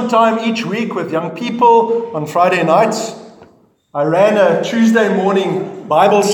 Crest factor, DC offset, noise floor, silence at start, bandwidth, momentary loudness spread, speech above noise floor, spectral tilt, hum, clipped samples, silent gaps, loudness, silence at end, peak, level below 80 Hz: 14 dB; under 0.1%; -48 dBFS; 0 s; 18 kHz; 9 LU; 35 dB; -5.5 dB/octave; none; under 0.1%; none; -14 LUFS; 0 s; 0 dBFS; -66 dBFS